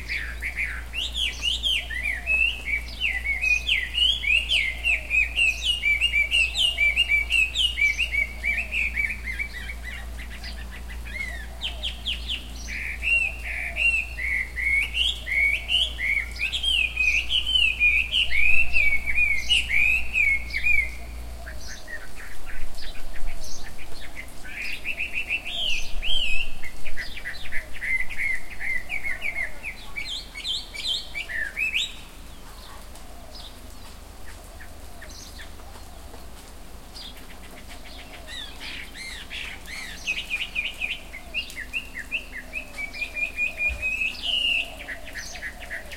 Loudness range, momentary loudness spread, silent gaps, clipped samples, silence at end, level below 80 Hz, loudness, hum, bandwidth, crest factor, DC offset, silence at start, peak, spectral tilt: 19 LU; 22 LU; none; under 0.1%; 0 s; -38 dBFS; -23 LUFS; none; 16.5 kHz; 20 dB; 0.6%; 0 s; -4 dBFS; -1 dB/octave